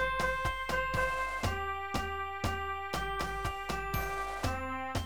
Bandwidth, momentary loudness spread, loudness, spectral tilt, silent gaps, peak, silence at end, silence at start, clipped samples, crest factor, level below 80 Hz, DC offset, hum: over 20 kHz; 5 LU; -34 LUFS; -4.5 dB/octave; none; -18 dBFS; 0 s; 0 s; under 0.1%; 16 dB; -44 dBFS; 0.3%; none